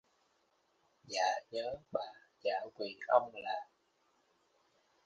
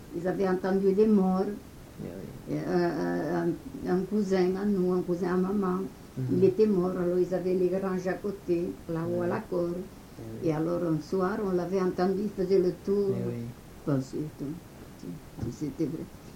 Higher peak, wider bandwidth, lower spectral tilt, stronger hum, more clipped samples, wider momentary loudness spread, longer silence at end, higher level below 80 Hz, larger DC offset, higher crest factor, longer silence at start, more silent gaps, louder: about the same, -14 dBFS vs -12 dBFS; second, 9.4 kHz vs 17 kHz; second, -2 dB/octave vs -8 dB/octave; neither; neither; second, 12 LU vs 15 LU; first, 1.45 s vs 0 s; second, -80 dBFS vs -54 dBFS; neither; first, 26 dB vs 16 dB; first, 1.05 s vs 0 s; neither; second, -37 LUFS vs -29 LUFS